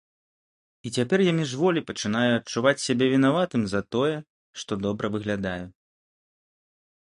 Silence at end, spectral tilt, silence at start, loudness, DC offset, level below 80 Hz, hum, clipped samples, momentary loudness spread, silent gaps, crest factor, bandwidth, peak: 1.4 s; -5.5 dB/octave; 0.85 s; -25 LUFS; under 0.1%; -58 dBFS; none; under 0.1%; 14 LU; 4.30-4.54 s; 20 dB; 11.5 kHz; -6 dBFS